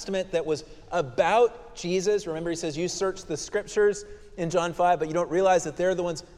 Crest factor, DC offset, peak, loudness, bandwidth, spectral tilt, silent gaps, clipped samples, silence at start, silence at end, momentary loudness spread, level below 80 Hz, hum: 18 dB; under 0.1%; -8 dBFS; -26 LUFS; 12.5 kHz; -4.5 dB/octave; none; under 0.1%; 0 s; 0.15 s; 9 LU; -52 dBFS; none